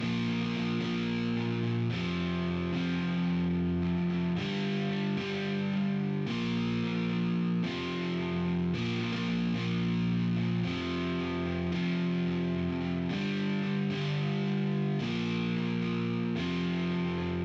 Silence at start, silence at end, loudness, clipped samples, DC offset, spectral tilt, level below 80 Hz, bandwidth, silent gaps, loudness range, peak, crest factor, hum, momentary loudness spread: 0 s; 0 s; -31 LUFS; under 0.1%; under 0.1%; -7.5 dB/octave; -56 dBFS; 7.2 kHz; none; 0 LU; -20 dBFS; 10 dB; none; 2 LU